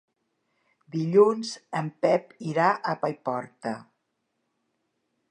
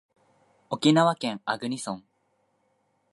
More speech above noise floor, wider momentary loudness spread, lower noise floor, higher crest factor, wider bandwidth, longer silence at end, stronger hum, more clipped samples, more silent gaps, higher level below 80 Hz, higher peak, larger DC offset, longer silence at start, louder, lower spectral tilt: first, 52 dB vs 46 dB; about the same, 15 LU vs 16 LU; first, -78 dBFS vs -71 dBFS; about the same, 22 dB vs 22 dB; second, 10 kHz vs 11.5 kHz; first, 1.5 s vs 1.15 s; neither; neither; neither; about the same, -80 dBFS vs -76 dBFS; about the same, -6 dBFS vs -8 dBFS; neither; first, 0.95 s vs 0.7 s; about the same, -26 LUFS vs -26 LUFS; about the same, -6 dB/octave vs -5 dB/octave